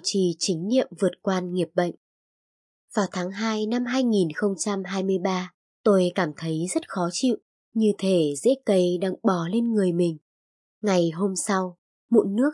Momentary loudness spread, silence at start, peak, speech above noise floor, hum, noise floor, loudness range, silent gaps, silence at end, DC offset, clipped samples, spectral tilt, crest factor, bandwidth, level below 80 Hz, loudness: 6 LU; 0.05 s; -6 dBFS; over 67 dB; none; under -90 dBFS; 3 LU; 1.97-2.88 s, 5.54-5.84 s, 7.42-7.72 s, 10.21-10.81 s, 11.78-12.09 s; 0 s; under 0.1%; under 0.1%; -5.5 dB/octave; 18 dB; 11.5 kHz; -78 dBFS; -24 LUFS